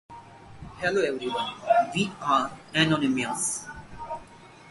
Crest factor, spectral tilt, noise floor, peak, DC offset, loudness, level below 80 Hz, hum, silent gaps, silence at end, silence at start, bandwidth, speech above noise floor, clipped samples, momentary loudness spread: 20 dB; -3.5 dB/octave; -49 dBFS; -8 dBFS; under 0.1%; -26 LUFS; -56 dBFS; none; none; 0 s; 0.1 s; 12 kHz; 22 dB; under 0.1%; 19 LU